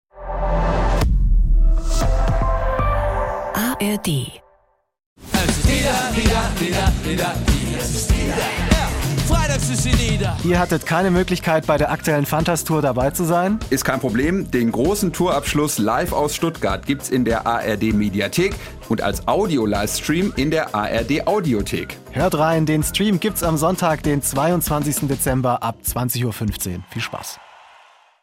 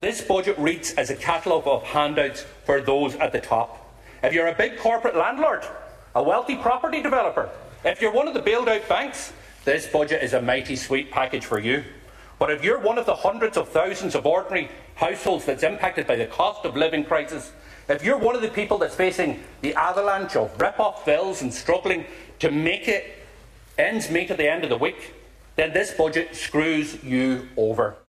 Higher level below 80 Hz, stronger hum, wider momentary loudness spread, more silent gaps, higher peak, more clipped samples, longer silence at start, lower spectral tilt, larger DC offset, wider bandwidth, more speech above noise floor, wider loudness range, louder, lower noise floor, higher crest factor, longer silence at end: first, -26 dBFS vs -52 dBFS; neither; about the same, 5 LU vs 6 LU; first, 5.06-5.16 s vs none; about the same, -2 dBFS vs -4 dBFS; neither; first, 0.15 s vs 0 s; about the same, -5 dB/octave vs -4 dB/octave; neither; first, 16.5 kHz vs 14 kHz; first, 41 dB vs 24 dB; about the same, 3 LU vs 1 LU; first, -20 LUFS vs -23 LUFS; first, -60 dBFS vs -47 dBFS; about the same, 18 dB vs 18 dB; first, 0.8 s vs 0.1 s